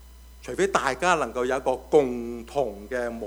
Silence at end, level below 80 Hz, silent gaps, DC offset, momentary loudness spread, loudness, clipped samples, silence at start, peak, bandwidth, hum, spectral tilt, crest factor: 0 s; -48 dBFS; none; under 0.1%; 10 LU; -25 LUFS; under 0.1%; 0 s; -4 dBFS; over 20 kHz; none; -4.5 dB/octave; 22 dB